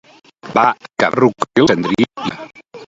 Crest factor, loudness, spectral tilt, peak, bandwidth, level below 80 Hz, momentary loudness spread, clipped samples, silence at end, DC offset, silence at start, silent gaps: 16 dB; -16 LUFS; -5.5 dB/octave; 0 dBFS; 7.8 kHz; -52 dBFS; 12 LU; under 0.1%; 0.05 s; under 0.1%; 0.45 s; none